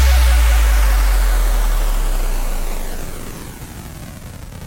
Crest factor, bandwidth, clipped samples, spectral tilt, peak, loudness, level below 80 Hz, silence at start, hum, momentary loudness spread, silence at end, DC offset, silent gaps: 12 dB; 17 kHz; under 0.1%; -4 dB/octave; -4 dBFS; -18 LUFS; -16 dBFS; 0 s; none; 18 LU; 0 s; under 0.1%; none